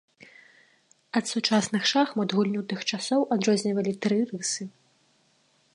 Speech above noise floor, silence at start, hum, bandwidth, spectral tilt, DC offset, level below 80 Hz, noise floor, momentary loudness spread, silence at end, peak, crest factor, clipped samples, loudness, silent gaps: 40 dB; 1.15 s; none; 11.5 kHz; -4 dB/octave; under 0.1%; -76 dBFS; -66 dBFS; 6 LU; 1.05 s; -8 dBFS; 20 dB; under 0.1%; -26 LUFS; none